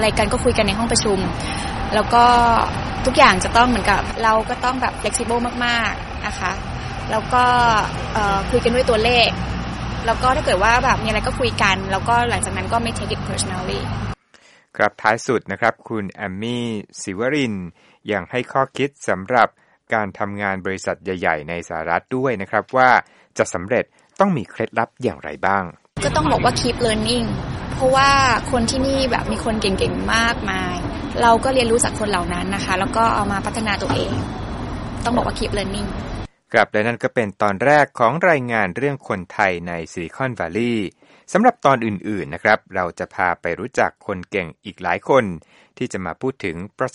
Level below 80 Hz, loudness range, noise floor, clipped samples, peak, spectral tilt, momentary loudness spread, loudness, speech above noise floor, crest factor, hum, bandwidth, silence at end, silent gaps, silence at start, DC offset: -34 dBFS; 5 LU; -52 dBFS; under 0.1%; 0 dBFS; -4.5 dB/octave; 12 LU; -19 LUFS; 33 dB; 20 dB; none; 11.5 kHz; 0.05 s; none; 0 s; under 0.1%